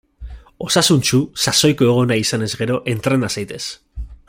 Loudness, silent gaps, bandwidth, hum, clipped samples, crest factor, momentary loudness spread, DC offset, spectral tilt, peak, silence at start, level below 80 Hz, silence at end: -16 LUFS; none; 16.5 kHz; none; under 0.1%; 18 dB; 15 LU; under 0.1%; -4 dB/octave; 0 dBFS; 0.2 s; -40 dBFS; 0.15 s